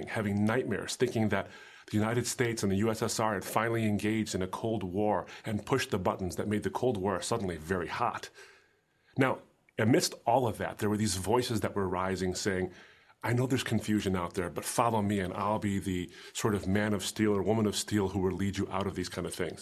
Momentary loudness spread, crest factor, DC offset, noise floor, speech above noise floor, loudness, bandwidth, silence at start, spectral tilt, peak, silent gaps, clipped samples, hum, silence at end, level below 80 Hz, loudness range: 7 LU; 20 dB; under 0.1%; -68 dBFS; 38 dB; -31 LUFS; 14 kHz; 0 s; -5 dB/octave; -10 dBFS; none; under 0.1%; none; 0 s; -54 dBFS; 2 LU